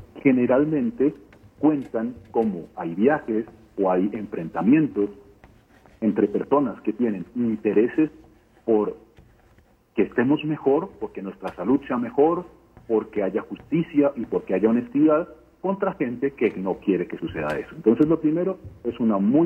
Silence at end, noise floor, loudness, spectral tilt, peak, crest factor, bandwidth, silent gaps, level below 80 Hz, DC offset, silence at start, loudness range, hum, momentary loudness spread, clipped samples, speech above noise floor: 0 s; -57 dBFS; -23 LUFS; -9.5 dB/octave; -6 dBFS; 18 dB; 4.5 kHz; none; -56 dBFS; under 0.1%; 0 s; 2 LU; none; 10 LU; under 0.1%; 35 dB